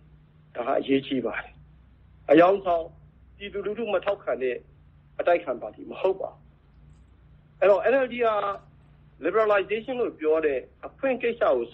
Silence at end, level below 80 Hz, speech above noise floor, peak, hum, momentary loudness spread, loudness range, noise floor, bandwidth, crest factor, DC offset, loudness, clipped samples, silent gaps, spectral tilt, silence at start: 0.05 s; -58 dBFS; 30 dB; -6 dBFS; none; 17 LU; 5 LU; -54 dBFS; 5.8 kHz; 22 dB; under 0.1%; -25 LUFS; under 0.1%; none; -7.5 dB/octave; 0.55 s